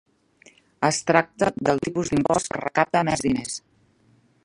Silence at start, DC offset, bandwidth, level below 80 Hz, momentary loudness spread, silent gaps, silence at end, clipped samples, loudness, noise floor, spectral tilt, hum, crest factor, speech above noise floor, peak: 0.8 s; under 0.1%; 11.5 kHz; -52 dBFS; 5 LU; none; 0.85 s; under 0.1%; -23 LUFS; -60 dBFS; -4.5 dB/octave; none; 24 dB; 38 dB; 0 dBFS